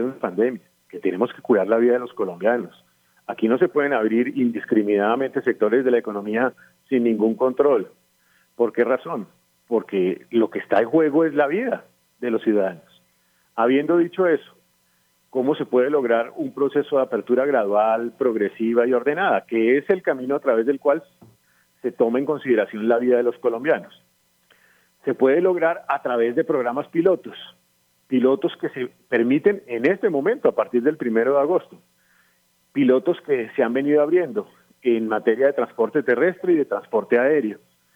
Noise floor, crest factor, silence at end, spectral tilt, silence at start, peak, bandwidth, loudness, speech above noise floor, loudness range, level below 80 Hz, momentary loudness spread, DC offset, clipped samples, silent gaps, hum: -64 dBFS; 16 dB; 0.4 s; -8 dB/octave; 0 s; -6 dBFS; 5.2 kHz; -21 LUFS; 44 dB; 2 LU; -74 dBFS; 8 LU; under 0.1%; under 0.1%; none; none